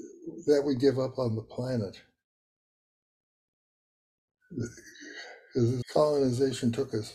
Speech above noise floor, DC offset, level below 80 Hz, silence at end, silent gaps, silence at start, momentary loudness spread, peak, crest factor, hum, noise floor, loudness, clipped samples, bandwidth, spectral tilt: over 62 dB; under 0.1%; -62 dBFS; 0 s; 2.24-4.28 s; 0 s; 18 LU; -12 dBFS; 20 dB; none; under -90 dBFS; -29 LUFS; under 0.1%; 13 kHz; -6.5 dB/octave